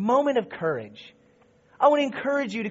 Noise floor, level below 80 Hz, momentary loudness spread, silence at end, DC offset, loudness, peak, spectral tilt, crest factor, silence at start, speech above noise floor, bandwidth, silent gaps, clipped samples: -59 dBFS; -72 dBFS; 10 LU; 0 s; under 0.1%; -24 LUFS; -6 dBFS; -3.5 dB/octave; 20 dB; 0 s; 35 dB; 7.6 kHz; none; under 0.1%